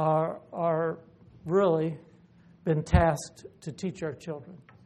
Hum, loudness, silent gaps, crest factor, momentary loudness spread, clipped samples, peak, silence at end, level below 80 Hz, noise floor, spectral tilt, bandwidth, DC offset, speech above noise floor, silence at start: none; -28 LUFS; none; 22 dB; 19 LU; under 0.1%; -6 dBFS; 0.3 s; -42 dBFS; -57 dBFS; -7 dB/octave; 12 kHz; under 0.1%; 28 dB; 0 s